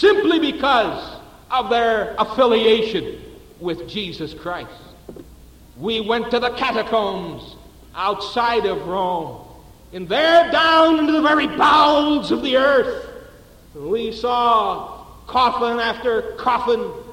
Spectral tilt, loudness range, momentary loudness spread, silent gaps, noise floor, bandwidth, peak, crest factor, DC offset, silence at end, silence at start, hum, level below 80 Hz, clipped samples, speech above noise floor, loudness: -5 dB/octave; 9 LU; 18 LU; none; -45 dBFS; 16.5 kHz; -2 dBFS; 16 dB; under 0.1%; 0 s; 0 s; none; -48 dBFS; under 0.1%; 26 dB; -18 LUFS